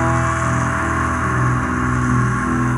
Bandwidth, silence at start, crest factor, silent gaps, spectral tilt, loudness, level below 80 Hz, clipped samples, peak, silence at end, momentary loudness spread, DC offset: 11.5 kHz; 0 s; 12 dB; none; -6.5 dB/octave; -18 LUFS; -32 dBFS; under 0.1%; -4 dBFS; 0 s; 1 LU; under 0.1%